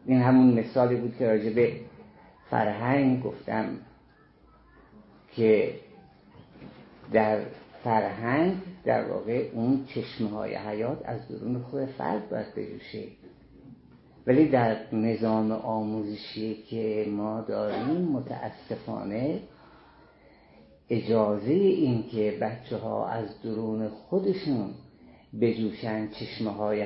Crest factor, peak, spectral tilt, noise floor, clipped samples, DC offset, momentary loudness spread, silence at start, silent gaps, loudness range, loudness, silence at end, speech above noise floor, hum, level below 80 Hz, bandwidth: 20 dB; -8 dBFS; -11.5 dB/octave; -58 dBFS; under 0.1%; under 0.1%; 14 LU; 0.05 s; none; 5 LU; -28 LUFS; 0 s; 31 dB; none; -64 dBFS; 5.8 kHz